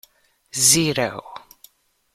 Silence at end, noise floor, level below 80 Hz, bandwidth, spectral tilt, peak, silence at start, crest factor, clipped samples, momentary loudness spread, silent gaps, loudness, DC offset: 0.75 s; -56 dBFS; -58 dBFS; 15.5 kHz; -2 dB/octave; -2 dBFS; 0.55 s; 22 dB; under 0.1%; 22 LU; none; -17 LUFS; under 0.1%